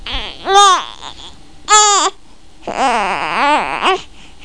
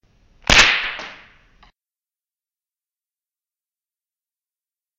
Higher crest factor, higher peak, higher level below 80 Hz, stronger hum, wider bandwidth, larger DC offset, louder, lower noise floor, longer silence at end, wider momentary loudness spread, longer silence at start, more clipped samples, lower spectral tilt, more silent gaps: second, 16 dB vs 24 dB; about the same, 0 dBFS vs 0 dBFS; about the same, -38 dBFS vs -38 dBFS; neither; second, 10.5 kHz vs 15.5 kHz; first, 2% vs under 0.1%; about the same, -12 LUFS vs -14 LUFS; second, -44 dBFS vs under -90 dBFS; second, 0 s vs 3.85 s; about the same, 21 LU vs 21 LU; second, 0 s vs 0.5 s; neither; about the same, 0 dB/octave vs -1 dB/octave; neither